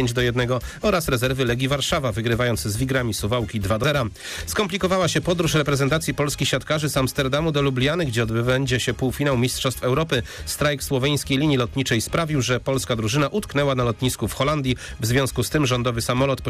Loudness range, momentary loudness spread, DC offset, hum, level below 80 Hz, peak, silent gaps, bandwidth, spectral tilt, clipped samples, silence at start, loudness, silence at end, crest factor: 1 LU; 3 LU; under 0.1%; none; -40 dBFS; -12 dBFS; none; 15.5 kHz; -5 dB/octave; under 0.1%; 0 s; -22 LUFS; 0 s; 10 dB